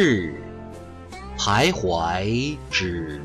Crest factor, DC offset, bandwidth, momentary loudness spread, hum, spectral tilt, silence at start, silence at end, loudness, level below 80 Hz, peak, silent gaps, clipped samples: 16 dB; under 0.1%; 14.5 kHz; 19 LU; none; -4.5 dB/octave; 0 s; 0 s; -23 LUFS; -40 dBFS; -8 dBFS; none; under 0.1%